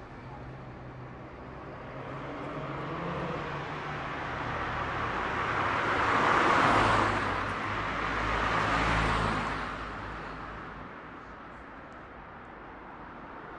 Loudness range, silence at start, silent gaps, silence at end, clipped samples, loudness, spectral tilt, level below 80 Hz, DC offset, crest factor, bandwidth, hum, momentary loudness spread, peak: 14 LU; 0 s; none; 0 s; under 0.1%; -30 LUFS; -5 dB/octave; -46 dBFS; under 0.1%; 20 dB; 11.5 kHz; none; 21 LU; -12 dBFS